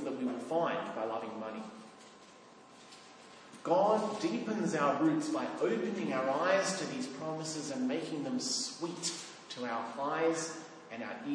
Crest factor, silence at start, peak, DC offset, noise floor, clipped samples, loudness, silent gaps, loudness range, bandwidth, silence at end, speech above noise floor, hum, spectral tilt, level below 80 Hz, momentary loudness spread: 20 dB; 0 s; -16 dBFS; under 0.1%; -56 dBFS; under 0.1%; -34 LUFS; none; 6 LU; 10.5 kHz; 0 s; 23 dB; none; -4 dB/octave; -86 dBFS; 21 LU